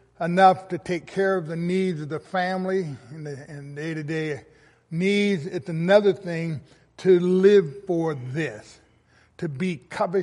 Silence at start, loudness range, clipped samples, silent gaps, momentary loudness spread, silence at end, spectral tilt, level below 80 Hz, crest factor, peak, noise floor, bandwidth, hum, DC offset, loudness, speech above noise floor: 0.2 s; 7 LU; under 0.1%; none; 17 LU; 0 s; -7 dB/octave; -66 dBFS; 20 dB; -4 dBFS; -59 dBFS; 11.5 kHz; none; under 0.1%; -23 LUFS; 36 dB